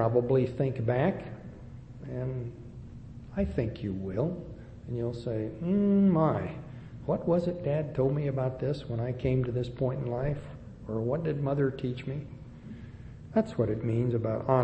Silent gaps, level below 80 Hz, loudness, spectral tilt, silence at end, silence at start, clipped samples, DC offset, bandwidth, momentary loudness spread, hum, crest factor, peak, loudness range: none; -50 dBFS; -30 LUFS; -10 dB/octave; 0 s; 0 s; under 0.1%; under 0.1%; 8.4 kHz; 19 LU; none; 20 dB; -10 dBFS; 6 LU